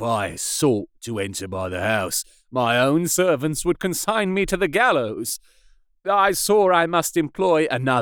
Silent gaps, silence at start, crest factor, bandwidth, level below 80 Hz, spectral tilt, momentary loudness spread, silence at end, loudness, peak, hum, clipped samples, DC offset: none; 0 s; 18 dB; over 20 kHz; -48 dBFS; -4 dB/octave; 10 LU; 0 s; -21 LUFS; -4 dBFS; none; under 0.1%; under 0.1%